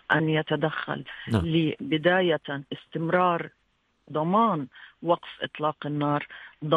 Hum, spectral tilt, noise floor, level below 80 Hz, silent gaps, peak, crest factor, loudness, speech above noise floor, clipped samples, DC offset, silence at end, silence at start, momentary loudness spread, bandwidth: none; -8 dB/octave; -63 dBFS; -56 dBFS; none; -6 dBFS; 20 dB; -26 LUFS; 37 dB; under 0.1%; under 0.1%; 0 s; 0.1 s; 12 LU; 10 kHz